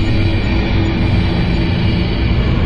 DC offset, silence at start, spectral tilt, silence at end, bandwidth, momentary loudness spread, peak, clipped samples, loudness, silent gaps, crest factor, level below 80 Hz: under 0.1%; 0 s; -8 dB/octave; 0 s; 7.2 kHz; 1 LU; -4 dBFS; under 0.1%; -15 LUFS; none; 10 dB; -20 dBFS